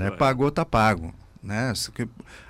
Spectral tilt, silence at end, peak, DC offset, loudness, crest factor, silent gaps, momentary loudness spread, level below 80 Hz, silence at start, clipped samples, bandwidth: -5.5 dB/octave; 0.05 s; -10 dBFS; under 0.1%; -24 LUFS; 16 dB; none; 14 LU; -44 dBFS; 0 s; under 0.1%; 16 kHz